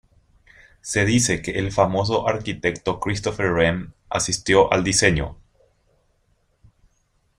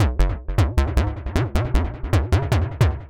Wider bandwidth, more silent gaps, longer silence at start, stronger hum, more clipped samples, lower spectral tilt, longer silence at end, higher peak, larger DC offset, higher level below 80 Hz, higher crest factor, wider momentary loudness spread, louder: about the same, 15.5 kHz vs 16.5 kHz; neither; first, 0.85 s vs 0 s; neither; neither; second, -4 dB/octave vs -7 dB/octave; first, 2.05 s vs 0 s; first, -2 dBFS vs -6 dBFS; neither; second, -44 dBFS vs -24 dBFS; first, 22 dB vs 14 dB; first, 9 LU vs 4 LU; about the same, -21 LUFS vs -22 LUFS